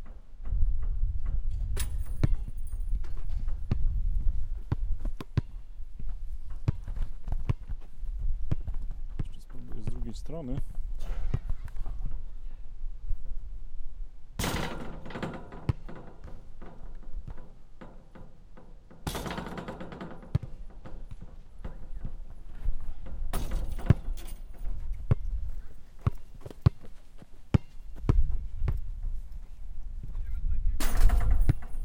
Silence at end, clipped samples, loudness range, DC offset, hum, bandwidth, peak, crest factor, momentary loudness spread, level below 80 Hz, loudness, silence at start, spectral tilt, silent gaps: 0 s; under 0.1%; 9 LU; under 0.1%; none; 16.5 kHz; -6 dBFS; 22 dB; 19 LU; -32 dBFS; -35 LUFS; 0 s; -6.5 dB/octave; none